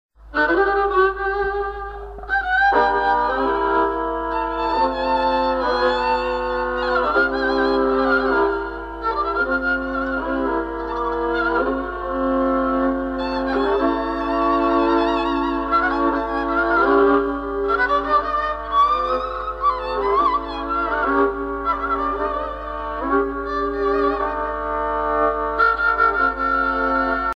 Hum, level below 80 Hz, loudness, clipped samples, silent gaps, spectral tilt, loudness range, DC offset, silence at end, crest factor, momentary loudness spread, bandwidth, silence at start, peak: none; -38 dBFS; -20 LUFS; under 0.1%; none; -6.5 dB/octave; 3 LU; under 0.1%; 0 s; 16 dB; 7 LU; 7.6 kHz; 0.2 s; -4 dBFS